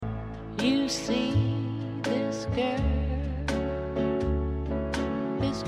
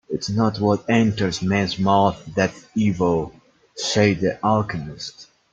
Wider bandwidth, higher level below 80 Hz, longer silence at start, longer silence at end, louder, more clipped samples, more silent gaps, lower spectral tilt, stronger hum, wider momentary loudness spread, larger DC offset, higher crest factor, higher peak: first, 12 kHz vs 8.8 kHz; first, -36 dBFS vs -52 dBFS; about the same, 0 s vs 0.1 s; second, 0 s vs 0.3 s; second, -29 LUFS vs -21 LUFS; neither; neither; about the same, -6 dB/octave vs -5.5 dB/octave; neither; second, 5 LU vs 12 LU; neither; about the same, 14 dB vs 18 dB; second, -14 dBFS vs -2 dBFS